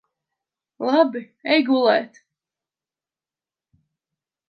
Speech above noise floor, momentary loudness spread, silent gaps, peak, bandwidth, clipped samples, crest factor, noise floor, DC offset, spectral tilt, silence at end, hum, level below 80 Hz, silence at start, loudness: over 71 dB; 12 LU; none; -4 dBFS; 6.6 kHz; under 0.1%; 22 dB; under -90 dBFS; under 0.1%; -5.5 dB/octave; 2.4 s; none; -80 dBFS; 0.8 s; -20 LUFS